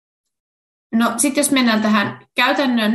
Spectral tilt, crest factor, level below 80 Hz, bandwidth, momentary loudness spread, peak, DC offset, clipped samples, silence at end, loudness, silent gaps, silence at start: -3 dB/octave; 16 dB; -62 dBFS; 13 kHz; 4 LU; -2 dBFS; under 0.1%; under 0.1%; 0 s; -17 LUFS; none; 0.9 s